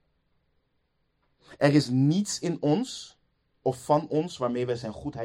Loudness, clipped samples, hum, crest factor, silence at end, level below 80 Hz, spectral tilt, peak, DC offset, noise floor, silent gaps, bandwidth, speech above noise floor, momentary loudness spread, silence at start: -27 LUFS; under 0.1%; none; 20 dB; 0 s; -62 dBFS; -6 dB/octave; -8 dBFS; under 0.1%; -73 dBFS; none; 15 kHz; 47 dB; 12 LU; 1.5 s